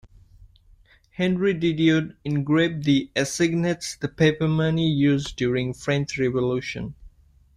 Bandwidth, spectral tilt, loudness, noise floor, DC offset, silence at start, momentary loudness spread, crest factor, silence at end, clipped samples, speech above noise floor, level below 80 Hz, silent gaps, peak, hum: 13 kHz; -6 dB/octave; -23 LUFS; -55 dBFS; under 0.1%; 1.2 s; 8 LU; 18 dB; 0.5 s; under 0.1%; 33 dB; -50 dBFS; none; -6 dBFS; none